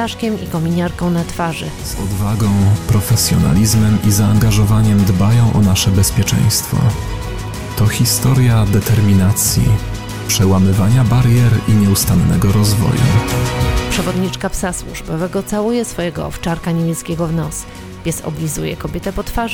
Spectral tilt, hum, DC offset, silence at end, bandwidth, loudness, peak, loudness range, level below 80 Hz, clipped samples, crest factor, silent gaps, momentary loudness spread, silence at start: -5.5 dB/octave; none; under 0.1%; 0 s; 16.5 kHz; -15 LUFS; -2 dBFS; 7 LU; -28 dBFS; under 0.1%; 12 dB; none; 10 LU; 0 s